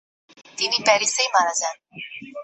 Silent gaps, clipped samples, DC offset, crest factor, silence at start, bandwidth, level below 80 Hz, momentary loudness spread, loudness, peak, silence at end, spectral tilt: none; under 0.1%; under 0.1%; 20 dB; 0.55 s; 8.6 kHz; -74 dBFS; 18 LU; -20 LUFS; -4 dBFS; 0 s; 0.5 dB/octave